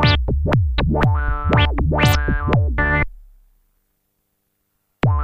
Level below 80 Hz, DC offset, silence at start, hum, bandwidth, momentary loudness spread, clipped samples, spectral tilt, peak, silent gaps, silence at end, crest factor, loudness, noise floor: -24 dBFS; under 0.1%; 0 s; none; 15.5 kHz; 4 LU; under 0.1%; -6.5 dB/octave; -2 dBFS; none; 0 s; 18 dB; -18 LUFS; -70 dBFS